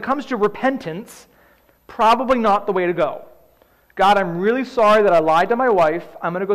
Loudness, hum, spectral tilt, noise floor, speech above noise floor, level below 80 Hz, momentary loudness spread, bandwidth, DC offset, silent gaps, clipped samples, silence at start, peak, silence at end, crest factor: -17 LUFS; none; -6 dB/octave; -55 dBFS; 38 dB; -52 dBFS; 13 LU; 15 kHz; 0.8%; none; under 0.1%; 0 s; -8 dBFS; 0 s; 12 dB